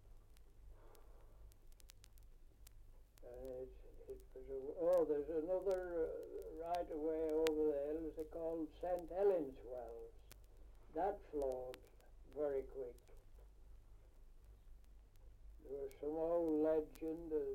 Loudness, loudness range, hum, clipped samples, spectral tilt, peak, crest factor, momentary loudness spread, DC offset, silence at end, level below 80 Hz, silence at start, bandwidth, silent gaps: -42 LUFS; 17 LU; none; under 0.1%; -6.5 dB/octave; -18 dBFS; 26 dB; 21 LU; under 0.1%; 0 s; -60 dBFS; 0.05 s; 16.5 kHz; none